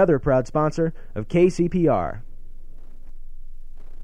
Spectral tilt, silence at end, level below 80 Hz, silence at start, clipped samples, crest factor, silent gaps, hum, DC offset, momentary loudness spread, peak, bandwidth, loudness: -8 dB/octave; 0 s; -34 dBFS; 0 s; under 0.1%; 16 dB; none; none; under 0.1%; 12 LU; -6 dBFS; 10 kHz; -21 LUFS